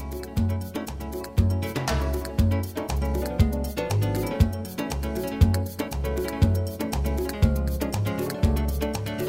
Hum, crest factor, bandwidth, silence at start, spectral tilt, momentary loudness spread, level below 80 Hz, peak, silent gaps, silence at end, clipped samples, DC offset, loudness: none; 20 dB; 16.5 kHz; 0 s; -6.5 dB/octave; 6 LU; -30 dBFS; -4 dBFS; none; 0 s; under 0.1%; under 0.1%; -26 LUFS